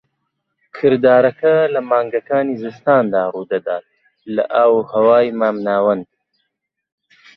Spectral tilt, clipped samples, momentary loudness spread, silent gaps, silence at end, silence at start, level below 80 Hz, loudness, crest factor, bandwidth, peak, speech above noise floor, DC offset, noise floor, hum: -8.5 dB/octave; under 0.1%; 10 LU; none; 1.35 s; 0.75 s; -64 dBFS; -16 LUFS; 14 dB; 5.6 kHz; -2 dBFS; 60 dB; under 0.1%; -75 dBFS; none